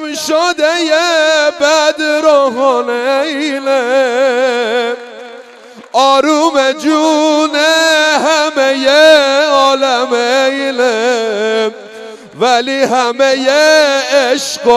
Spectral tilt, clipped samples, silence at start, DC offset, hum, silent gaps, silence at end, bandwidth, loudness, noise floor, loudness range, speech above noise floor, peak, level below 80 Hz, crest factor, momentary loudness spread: -1.5 dB/octave; under 0.1%; 0 s; under 0.1%; none; none; 0 s; 15 kHz; -11 LUFS; -35 dBFS; 4 LU; 25 dB; 0 dBFS; -58 dBFS; 12 dB; 7 LU